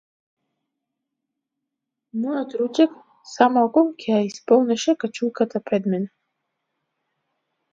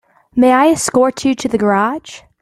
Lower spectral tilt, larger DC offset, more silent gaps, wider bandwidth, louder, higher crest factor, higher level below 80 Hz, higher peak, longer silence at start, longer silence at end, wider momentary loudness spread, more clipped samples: about the same, -5.5 dB/octave vs -4.5 dB/octave; neither; neither; second, 7.8 kHz vs 13.5 kHz; second, -21 LUFS vs -14 LUFS; first, 22 dB vs 14 dB; second, -76 dBFS vs -50 dBFS; about the same, -2 dBFS vs -2 dBFS; first, 2.15 s vs 0.35 s; first, 1.65 s vs 0.25 s; about the same, 10 LU vs 9 LU; neither